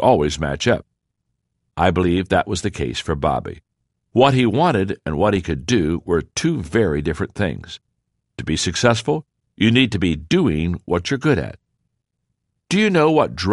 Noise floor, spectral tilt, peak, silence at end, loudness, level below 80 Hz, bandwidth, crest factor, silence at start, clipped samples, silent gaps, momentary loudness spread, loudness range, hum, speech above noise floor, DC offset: -75 dBFS; -5.5 dB/octave; 0 dBFS; 0 s; -19 LUFS; -40 dBFS; 11.5 kHz; 18 dB; 0 s; under 0.1%; none; 9 LU; 3 LU; none; 57 dB; under 0.1%